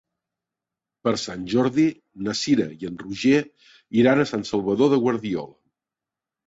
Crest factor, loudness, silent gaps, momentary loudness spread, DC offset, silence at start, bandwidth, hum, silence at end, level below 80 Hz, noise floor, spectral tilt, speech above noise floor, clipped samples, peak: 18 dB; -22 LUFS; none; 12 LU; under 0.1%; 1.05 s; 8 kHz; none; 1 s; -60 dBFS; -88 dBFS; -5.5 dB/octave; 67 dB; under 0.1%; -6 dBFS